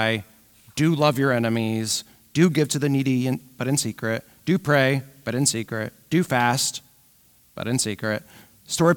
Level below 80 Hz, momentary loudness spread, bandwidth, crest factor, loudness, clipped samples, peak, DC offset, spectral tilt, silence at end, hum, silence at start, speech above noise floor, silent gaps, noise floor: -60 dBFS; 10 LU; 19.5 kHz; 18 dB; -23 LUFS; under 0.1%; -4 dBFS; under 0.1%; -4.5 dB/octave; 0 s; none; 0 s; 35 dB; none; -57 dBFS